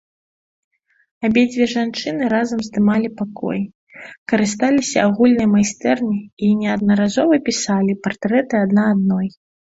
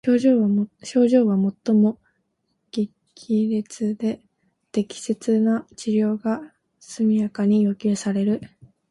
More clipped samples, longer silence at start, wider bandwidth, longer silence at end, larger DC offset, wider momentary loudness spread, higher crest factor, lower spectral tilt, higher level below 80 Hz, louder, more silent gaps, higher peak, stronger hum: neither; first, 1.2 s vs 0.05 s; second, 8 kHz vs 11.5 kHz; about the same, 0.45 s vs 0.45 s; neither; about the same, 9 LU vs 10 LU; about the same, 16 dB vs 16 dB; second, -5.5 dB/octave vs -7 dB/octave; first, -54 dBFS vs -66 dBFS; first, -18 LUFS vs -22 LUFS; first, 3.75-3.87 s, 4.18-4.26 s, 6.33-6.37 s vs none; first, -2 dBFS vs -6 dBFS; neither